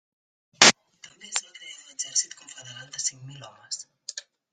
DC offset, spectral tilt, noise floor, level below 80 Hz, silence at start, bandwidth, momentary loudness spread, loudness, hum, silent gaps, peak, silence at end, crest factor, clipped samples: under 0.1%; 0 dB/octave; -53 dBFS; -72 dBFS; 0.6 s; 13 kHz; 26 LU; -22 LUFS; none; none; 0 dBFS; 0.3 s; 28 dB; under 0.1%